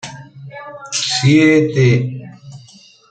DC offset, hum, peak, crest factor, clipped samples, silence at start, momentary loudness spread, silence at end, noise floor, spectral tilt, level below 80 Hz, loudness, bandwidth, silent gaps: under 0.1%; none; -2 dBFS; 14 dB; under 0.1%; 0.05 s; 24 LU; 0.55 s; -44 dBFS; -5 dB/octave; -54 dBFS; -13 LUFS; 9.2 kHz; none